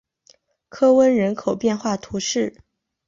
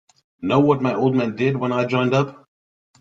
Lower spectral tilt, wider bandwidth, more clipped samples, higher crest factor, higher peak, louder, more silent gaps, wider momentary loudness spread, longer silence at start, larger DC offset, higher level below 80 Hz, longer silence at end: second, -4.5 dB/octave vs -7.5 dB/octave; about the same, 7.6 kHz vs 7.6 kHz; neither; about the same, 16 dB vs 18 dB; about the same, -4 dBFS vs -2 dBFS; about the same, -20 LUFS vs -20 LUFS; neither; first, 10 LU vs 5 LU; first, 0.75 s vs 0.4 s; neither; about the same, -58 dBFS vs -60 dBFS; about the same, 0.55 s vs 0.65 s